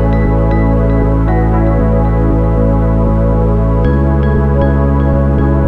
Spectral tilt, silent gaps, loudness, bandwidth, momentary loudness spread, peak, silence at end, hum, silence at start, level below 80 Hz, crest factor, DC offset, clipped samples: -11 dB/octave; none; -12 LUFS; 4.2 kHz; 1 LU; 0 dBFS; 0 s; none; 0 s; -14 dBFS; 10 dB; under 0.1%; under 0.1%